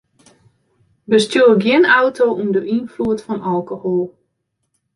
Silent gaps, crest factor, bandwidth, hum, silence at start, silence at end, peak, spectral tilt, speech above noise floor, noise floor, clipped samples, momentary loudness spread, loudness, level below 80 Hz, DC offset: none; 16 dB; 11.5 kHz; none; 1.1 s; 0.85 s; -2 dBFS; -5.5 dB/octave; 56 dB; -71 dBFS; under 0.1%; 10 LU; -16 LUFS; -58 dBFS; under 0.1%